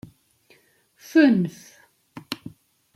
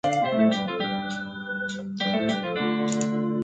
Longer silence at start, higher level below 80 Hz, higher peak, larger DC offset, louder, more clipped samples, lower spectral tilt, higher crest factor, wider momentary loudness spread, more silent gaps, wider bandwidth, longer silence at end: first, 1.15 s vs 0.05 s; second, -70 dBFS vs -64 dBFS; first, -4 dBFS vs -10 dBFS; neither; first, -22 LUFS vs -26 LUFS; neither; first, -6.5 dB/octave vs -5 dB/octave; about the same, 20 dB vs 16 dB; first, 18 LU vs 9 LU; neither; first, 14.5 kHz vs 9.2 kHz; first, 0.45 s vs 0 s